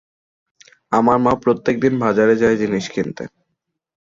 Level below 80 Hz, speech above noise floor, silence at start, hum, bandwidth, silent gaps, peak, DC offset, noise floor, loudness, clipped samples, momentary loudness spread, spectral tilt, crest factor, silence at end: -50 dBFS; 59 dB; 0.9 s; none; 7.6 kHz; none; -2 dBFS; under 0.1%; -76 dBFS; -17 LUFS; under 0.1%; 11 LU; -6.5 dB/octave; 16 dB; 0.8 s